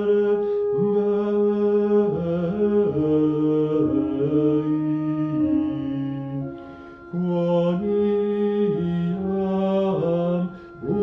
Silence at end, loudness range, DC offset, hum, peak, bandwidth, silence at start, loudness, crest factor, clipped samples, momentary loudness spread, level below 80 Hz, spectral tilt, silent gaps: 0 s; 3 LU; under 0.1%; none; -10 dBFS; 5.6 kHz; 0 s; -22 LUFS; 12 dB; under 0.1%; 8 LU; -54 dBFS; -10.5 dB/octave; none